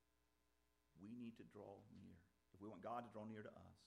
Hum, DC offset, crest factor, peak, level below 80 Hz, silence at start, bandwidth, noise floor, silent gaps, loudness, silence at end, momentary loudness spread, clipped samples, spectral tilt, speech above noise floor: none; under 0.1%; 20 dB; -38 dBFS; -86 dBFS; 0.95 s; 10.5 kHz; -85 dBFS; none; -58 LUFS; 0 s; 13 LU; under 0.1%; -7.5 dB/octave; 28 dB